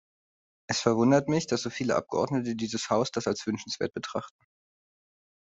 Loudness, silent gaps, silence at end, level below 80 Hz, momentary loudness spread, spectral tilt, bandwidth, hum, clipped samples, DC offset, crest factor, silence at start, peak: -28 LUFS; none; 1.15 s; -66 dBFS; 10 LU; -5 dB/octave; 8.2 kHz; none; under 0.1%; under 0.1%; 22 dB; 0.7 s; -8 dBFS